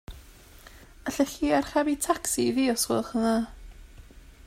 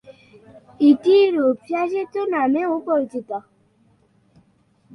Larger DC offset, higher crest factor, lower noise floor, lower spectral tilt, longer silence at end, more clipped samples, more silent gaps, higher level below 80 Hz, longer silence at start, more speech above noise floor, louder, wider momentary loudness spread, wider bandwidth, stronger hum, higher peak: neither; about the same, 20 dB vs 18 dB; second, -50 dBFS vs -60 dBFS; second, -3.5 dB/octave vs -6.5 dB/octave; second, 0.15 s vs 1.55 s; neither; neither; first, -48 dBFS vs -68 dBFS; about the same, 0.1 s vs 0.1 s; second, 24 dB vs 41 dB; second, -26 LUFS vs -19 LUFS; about the same, 11 LU vs 13 LU; first, 16 kHz vs 6.4 kHz; neither; second, -10 dBFS vs -4 dBFS